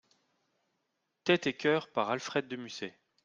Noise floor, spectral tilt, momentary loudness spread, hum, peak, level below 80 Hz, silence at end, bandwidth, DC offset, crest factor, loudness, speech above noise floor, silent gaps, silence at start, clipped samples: -82 dBFS; -4.5 dB/octave; 13 LU; none; -10 dBFS; -76 dBFS; 0.35 s; 7.6 kHz; under 0.1%; 24 dB; -32 LUFS; 50 dB; none; 1.25 s; under 0.1%